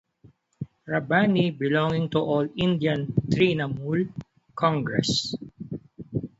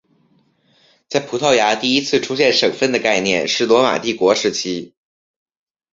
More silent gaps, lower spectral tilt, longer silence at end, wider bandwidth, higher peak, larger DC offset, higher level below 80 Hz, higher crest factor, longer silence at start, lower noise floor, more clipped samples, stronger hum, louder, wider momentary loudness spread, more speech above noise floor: neither; first, -6 dB/octave vs -3 dB/octave; second, 0.1 s vs 1.05 s; about the same, 8 kHz vs 7.8 kHz; second, -6 dBFS vs -2 dBFS; neither; about the same, -56 dBFS vs -58 dBFS; about the same, 20 dB vs 18 dB; second, 0.25 s vs 1.1 s; about the same, -57 dBFS vs -59 dBFS; neither; neither; second, -25 LUFS vs -16 LUFS; first, 16 LU vs 8 LU; second, 34 dB vs 42 dB